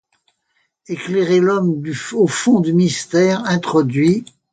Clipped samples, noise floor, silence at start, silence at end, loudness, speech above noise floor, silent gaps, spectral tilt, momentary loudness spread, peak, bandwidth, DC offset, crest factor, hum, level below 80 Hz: under 0.1%; -67 dBFS; 0.9 s; 0.3 s; -16 LUFS; 51 dB; none; -6 dB/octave; 9 LU; -2 dBFS; 9.4 kHz; under 0.1%; 14 dB; none; -60 dBFS